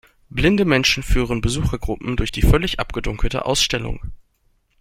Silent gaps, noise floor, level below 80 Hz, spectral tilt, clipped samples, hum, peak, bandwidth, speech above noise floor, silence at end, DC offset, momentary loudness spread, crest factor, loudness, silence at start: none; -63 dBFS; -26 dBFS; -4.5 dB/octave; under 0.1%; none; -2 dBFS; 16 kHz; 44 dB; 0.65 s; under 0.1%; 10 LU; 18 dB; -20 LUFS; 0.35 s